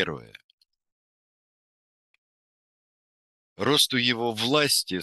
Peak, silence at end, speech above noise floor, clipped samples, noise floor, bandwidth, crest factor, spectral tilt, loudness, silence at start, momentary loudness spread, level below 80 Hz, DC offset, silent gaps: -6 dBFS; 0 s; over 65 dB; under 0.1%; under -90 dBFS; 12.5 kHz; 22 dB; -2.5 dB/octave; -23 LUFS; 0 s; 10 LU; -68 dBFS; under 0.1%; 0.44-0.58 s, 0.92-3.56 s